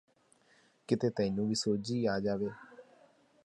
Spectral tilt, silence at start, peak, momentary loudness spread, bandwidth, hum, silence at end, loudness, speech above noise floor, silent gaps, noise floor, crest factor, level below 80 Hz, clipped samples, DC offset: -5.5 dB/octave; 0.9 s; -14 dBFS; 8 LU; 11.5 kHz; none; 0.65 s; -33 LUFS; 35 dB; none; -68 dBFS; 20 dB; -66 dBFS; under 0.1%; under 0.1%